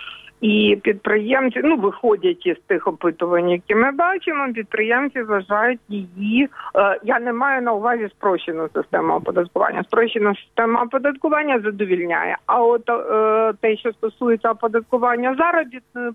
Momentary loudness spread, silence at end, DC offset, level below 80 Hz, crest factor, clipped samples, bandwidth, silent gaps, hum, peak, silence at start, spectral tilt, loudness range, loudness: 5 LU; 0 s; under 0.1%; -62 dBFS; 16 dB; under 0.1%; 3.9 kHz; none; none; -2 dBFS; 0 s; -7.5 dB/octave; 1 LU; -19 LUFS